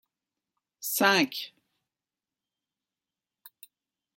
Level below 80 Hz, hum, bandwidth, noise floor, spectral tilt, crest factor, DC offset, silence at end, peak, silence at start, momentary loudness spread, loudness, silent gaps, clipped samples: -82 dBFS; none; 16.5 kHz; under -90 dBFS; -2.5 dB/octave; 24 dB; under 0.1%; 2.7 s; -10 dBFS; 0.8 s; 16 LU; -26 LUFS; none; under 0.1%